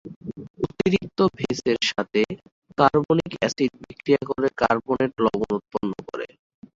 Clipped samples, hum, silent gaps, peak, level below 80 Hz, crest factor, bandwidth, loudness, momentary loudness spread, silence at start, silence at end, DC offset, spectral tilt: under 0.1%; none; 0.16-0.21 s, 0.50-0.54 s, 2.52-2.62 s; -2 dBFS; -54 dBFS; 22 dB; 7.8 kHz; -23 LUFS; 13 LU; 0.05 s; 0.5 s; under 0.1%; -5.5 dB/octave